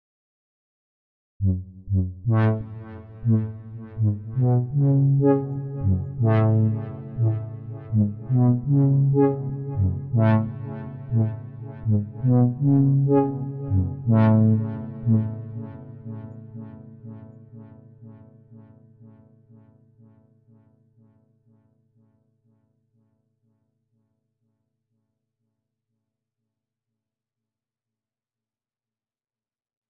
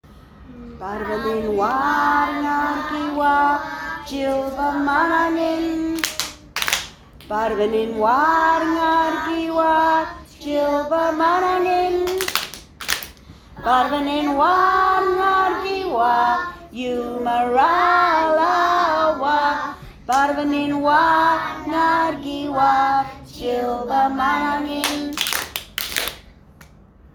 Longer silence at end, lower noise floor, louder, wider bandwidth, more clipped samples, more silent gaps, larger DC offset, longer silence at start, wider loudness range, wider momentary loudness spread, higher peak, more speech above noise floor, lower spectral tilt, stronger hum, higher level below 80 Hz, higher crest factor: first, 10.8 s vs 0.5 s; first, under -90 dBFS vs -47 dBFS; second, -22 LUFS vs -19 LUFS; second, 3.6 kHz vs over 20 kHz; neither; neither; neither; first, 1.4 s vs 0.1 s; first, 10 LU vs 3 LU; first, 19 LU vs 11 LU; second, -8 dBFS vs 0 dBFS; first, over 70 dB vs 29 dB; first, -13.5 dB/octave vs -3 dB/octave; neither; second, -56 dBFS vs -48 dBFS; about the same, 18 dB vs 20 dB